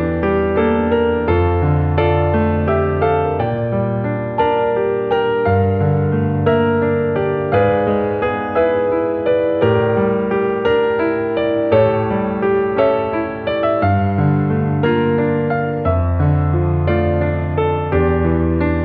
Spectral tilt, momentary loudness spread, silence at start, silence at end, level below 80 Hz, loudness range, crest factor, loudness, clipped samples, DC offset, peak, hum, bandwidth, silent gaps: -11 dB/octave; 3 LU; 0 s; 0 s; -34 dBFS; 1 LU; 14 dB; -16 LUFS; under 0.1%; under 0.1%; -2 dBFS; none; 4.6 kHz; none